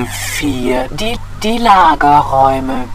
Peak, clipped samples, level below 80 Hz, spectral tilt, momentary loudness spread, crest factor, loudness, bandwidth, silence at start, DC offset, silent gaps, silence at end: 0 dBFS; 0.2%; -26 dBFS; -4.5 dB/octave; 11 LU; 12 dB; -12 LUFS; 16 kHz; 0 s; under 0.1%; none; 0 s